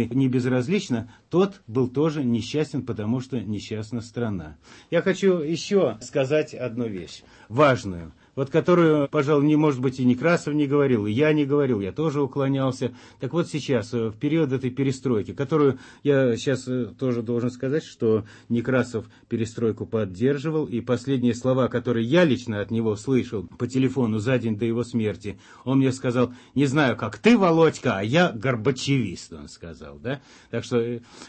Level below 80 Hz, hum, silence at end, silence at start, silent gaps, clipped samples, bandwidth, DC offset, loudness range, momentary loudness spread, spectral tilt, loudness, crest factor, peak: -58 dBFS; none; 0 s; 0 s; none; under 0.1%; 8.8 kHz; under 0.1%; 5 LU; 12 LU; -7 dB/octave; -24 LUFS; 18 dB; -6 dBFS